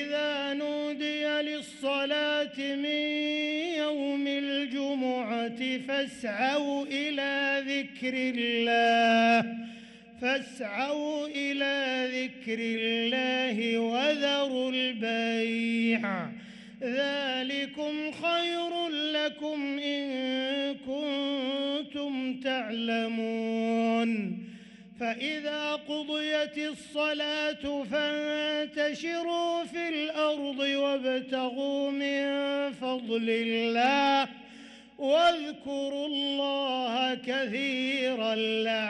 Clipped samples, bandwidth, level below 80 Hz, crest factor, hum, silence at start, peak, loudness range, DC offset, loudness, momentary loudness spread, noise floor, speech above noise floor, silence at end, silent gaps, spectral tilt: under 0.1%; 11.5 kHz; -72 dBFS; 14 dB; none; 0 s; -14 dBFS; 4 LU; under 0.1%; -29 LUFS; 7 LU; -50 dBFS; 21 dB; 0 s; none; -4 dB/octave